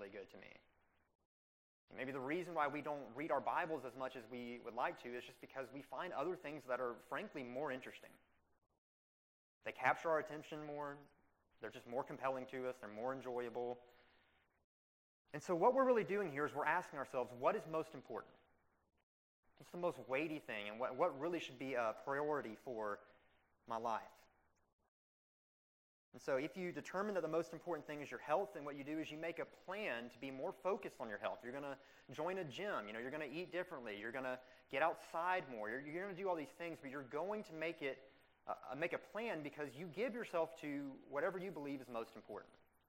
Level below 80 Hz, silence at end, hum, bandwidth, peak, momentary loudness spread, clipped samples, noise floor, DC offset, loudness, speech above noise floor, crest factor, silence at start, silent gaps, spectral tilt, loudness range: -84 dBFS; 0.4 s; none; 16 kHz; -20 dBFS; 12 LU; under 0.1%; -78 dBFS; under 0.1%; -44 LUFS; 34 dB; 26 dB; 0 s; 1.15-1.19 s, 1.25-1.88 s, 8.78-9.61 s, 14.64-15.25 s, 19.03-19.43 s, 24.73-24.79 s, 24.88-26.12 s; -5.5 dB/octave; 6 LU